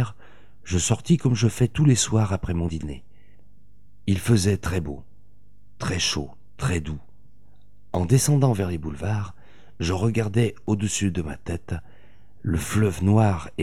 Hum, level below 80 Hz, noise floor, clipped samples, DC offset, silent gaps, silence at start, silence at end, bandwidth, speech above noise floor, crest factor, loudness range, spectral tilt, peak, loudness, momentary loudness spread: 50 Hz at -50 dBFS; -42 dBFS; -57 dBFS; under 0.1%; 1%; none; 0 s; 0 s; 15 kHz; 35 dB; 18 dB; 4 LU; -5.5 dB/octave; -6 dBFS; -24 LUFS; 14 LU